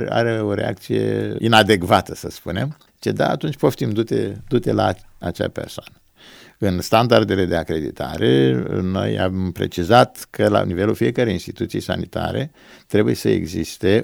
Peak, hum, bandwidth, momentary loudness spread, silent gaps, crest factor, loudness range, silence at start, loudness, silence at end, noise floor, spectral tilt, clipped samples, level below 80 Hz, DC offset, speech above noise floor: 0 dBFS; none; over 20 kHz; 11 LU; none; 20 dB; 3 LU; 0 s; -20 LUFS; 0 s; -46 dBFS; -6 dB/octave; under 0.1%; -46 dBFS; under 0.1%; 27 dB